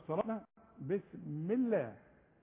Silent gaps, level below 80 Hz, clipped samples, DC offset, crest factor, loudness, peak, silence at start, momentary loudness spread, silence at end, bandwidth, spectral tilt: none; -74 dBFS; under 0.1%; under 0.1%; 18 dB; -38 LUFS; -20 dBFS; 0 s; 12 LU; 0.45 s; 3.7 kHz; -8.5 dB/octave